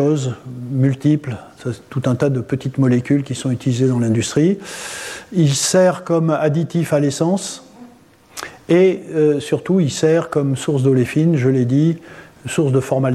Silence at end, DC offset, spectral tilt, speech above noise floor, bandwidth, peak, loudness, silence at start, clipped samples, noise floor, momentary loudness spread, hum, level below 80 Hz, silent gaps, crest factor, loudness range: 0 s; under 0.1%; -6 dB/octave; 30 dB; 14 kHz; -4 dBFS; -17 LUFS; 0 s; under 0.1%; -47 dBFS; 13 LU; none; -56 dBFS; none; 14 dB; 2 LU